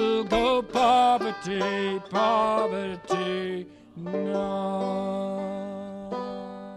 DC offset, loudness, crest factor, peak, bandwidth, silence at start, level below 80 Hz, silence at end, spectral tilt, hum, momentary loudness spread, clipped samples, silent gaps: under 0.1%; -26 LUFS; 16 dB; -10 dBFS; 12 kHz; 0 s; -54 dBFS; 0 s; -5.5 dB/octave; none; 14 LU; under 0.1%; none